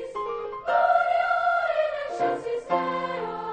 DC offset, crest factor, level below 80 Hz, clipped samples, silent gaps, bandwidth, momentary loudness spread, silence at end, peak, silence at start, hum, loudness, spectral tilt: under 0.1%; 16 dB; -62 dBFS; under 0.1%; none; 9 kHz; 10 LU; 0 s; -10 dBFS; 0 s; none; -25 LUFS; -5 dB/octave